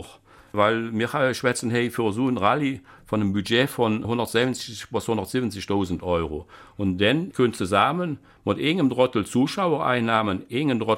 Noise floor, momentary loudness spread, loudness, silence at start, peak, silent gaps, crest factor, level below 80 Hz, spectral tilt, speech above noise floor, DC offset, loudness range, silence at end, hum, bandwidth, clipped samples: -49 dBFS; 8 LU; -24 LUFS; 0 s; -4 dBFS; none; 18 dB; -52 dBFS; -5.5 dB/octave; 26 dB; under 0.1%; 3 LU; 0 s; none; 16.5 kHz; under 0.1%